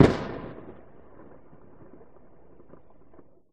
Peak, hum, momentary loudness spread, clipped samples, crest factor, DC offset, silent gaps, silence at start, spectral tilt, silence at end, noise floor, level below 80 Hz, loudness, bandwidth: -2 dBFS; none; 21 LU; under 0.1%; 28 dB; 0.4%; none; 0 s; -7.5 dB/octave; 2.8 s; -56 dBFS; -48 dBFS; -28 LUFS; 10 kHz